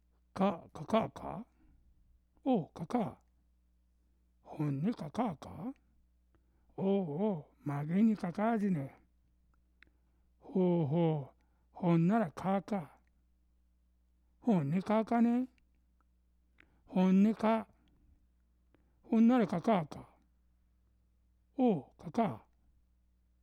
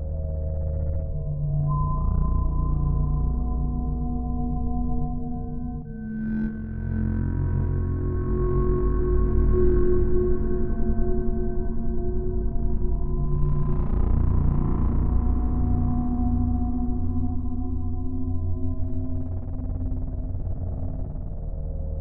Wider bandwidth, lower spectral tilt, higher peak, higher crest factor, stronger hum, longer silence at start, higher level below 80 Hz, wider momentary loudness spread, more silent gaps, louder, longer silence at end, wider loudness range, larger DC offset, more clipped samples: first, 9.6 kHz vs 2.1 kHz; second, -9 dB/octave vs -13 dB/octave; second, -18 dBFS vs -10 dBFS; about the same, 16 dB vs 14 dB; neither; first, 0.35 s vs 0 s; second, -68 dBFS vs -26 dBFS; first, 16 LU vs 8 LU; neither; second, -33 LUFS vs -27 LUFS; first, 1.05 s vs 0 s; about the same, 7 LU vs 6 LU; neither; neither